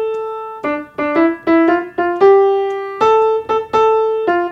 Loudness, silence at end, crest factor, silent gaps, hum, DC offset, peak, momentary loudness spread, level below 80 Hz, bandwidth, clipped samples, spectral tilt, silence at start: -15 LUFS; 0 s; 14 dB; none; none; under 0.1%; 0 dBFS; 11 LU; -54 dBFS; 7.4 kHz; under 0.1%; -6 dB/octave; 0 s